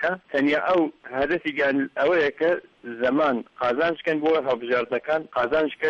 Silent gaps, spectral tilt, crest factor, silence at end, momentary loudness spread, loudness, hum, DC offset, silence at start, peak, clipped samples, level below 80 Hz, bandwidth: none; -6.5 dB/octave; 12 dB; 0 s; 5 LU; -23 LUFS; none; under 0.1%; 0 s; -12 dBFS; under 0.1%; -60 dBFS; 7.2 kHz